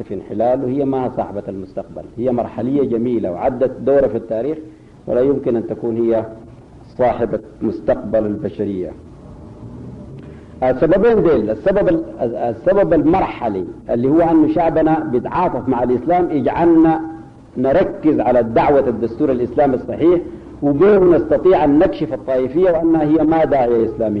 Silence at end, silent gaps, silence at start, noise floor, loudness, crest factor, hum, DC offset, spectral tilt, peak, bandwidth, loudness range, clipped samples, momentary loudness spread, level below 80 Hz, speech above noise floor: 0 s; none; 0 s; -40 dBFS; -16 LUFS; 12 dB; none; under 0.1%; -9.5 dB/octave; -4 dBFS; 5.4 kHz; 6 LU; under 0.1%; 14 LU; -40 dBFS; 24 dB